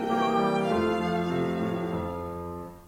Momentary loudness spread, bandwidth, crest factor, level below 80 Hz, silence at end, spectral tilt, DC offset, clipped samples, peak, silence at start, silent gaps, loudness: 11 LU; 16.5 kHz; 14 dB; -54 dBFS; 0 s; -7 dB/octave; under 0.1%; under 0.1%; -14 dBFS; 0 s; none; -28 LUFS